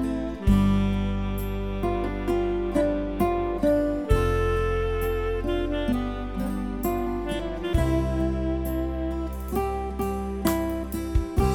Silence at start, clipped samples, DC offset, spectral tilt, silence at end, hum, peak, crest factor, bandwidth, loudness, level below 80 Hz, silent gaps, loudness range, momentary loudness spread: 0 s; under 0.1%; 0.2%; -7 dB/octave; 0 s; none; -8 dBFS; 18 dB; 19 kHz; -26 LUFS; -30 dBFS; none; 3 LU; 7 LU